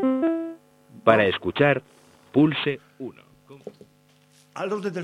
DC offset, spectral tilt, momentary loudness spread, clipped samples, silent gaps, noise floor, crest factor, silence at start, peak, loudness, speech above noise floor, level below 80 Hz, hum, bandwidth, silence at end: under 0.1%; -7 dB/octave; 23 LU; under 0.1%; none; -58 dBFS; 24 dB; 0 s; -2 dBFS; -23 LUFS; 37 dB; -64 dBFS; none; 11 kHz; 0 s